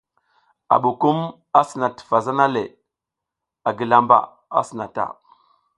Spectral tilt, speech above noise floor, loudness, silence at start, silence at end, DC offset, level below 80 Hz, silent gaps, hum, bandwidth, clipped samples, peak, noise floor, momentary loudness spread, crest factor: -6.5 dB/octave; 66 dB; -20 LUFS; 0.7 s; 0.65 s; under 0.1%; -66 dBFS; none; none; 11.5 kHz; under 0.1%; 0 dBFS; -85 dBFS; 10 LU; 20 dB